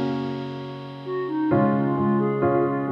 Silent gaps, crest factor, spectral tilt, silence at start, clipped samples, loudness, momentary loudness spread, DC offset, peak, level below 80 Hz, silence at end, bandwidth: none; 14 dB; -9.5 dB/octave; 0 s; under 0.1%; -23 LUFS; 13 LU; under 0.1%; -8 dBFS; -60 dBFS; 0 s; 6 kHz